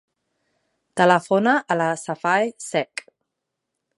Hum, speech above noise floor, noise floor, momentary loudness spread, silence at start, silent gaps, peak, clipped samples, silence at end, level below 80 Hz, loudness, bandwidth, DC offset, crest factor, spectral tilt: none; 61 dB; -81 dBFS; 13 LU; 0.95 s; none; -2 dBFS; under 0.1%; 1.15 s; -76 dBFS; -21 LUFS; 11.5 kHz; under 0.1%; 22 dB; -5 dB/octave